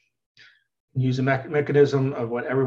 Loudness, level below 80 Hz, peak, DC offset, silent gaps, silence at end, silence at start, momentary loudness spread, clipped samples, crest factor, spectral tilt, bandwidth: -23 LUFS; -62 dBFS; -6 dBFS; under 0.1%; none; 0 s; 0.95 s; 8 LU; under 0.1%; 18 dB; -8 dB/octave; 7.4 kHz